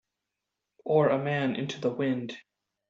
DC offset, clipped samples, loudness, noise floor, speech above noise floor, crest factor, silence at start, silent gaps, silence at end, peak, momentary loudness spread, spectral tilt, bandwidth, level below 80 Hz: under 0.1%; under 0.1%; -28 LUFS; -86 dBFS; 58 dB; 18 dB; 0.85 s; none; 0.5 s; -12 dBFS; 17 LU; -5.5 dB/octave; 7.8 kHz; -74 dBFS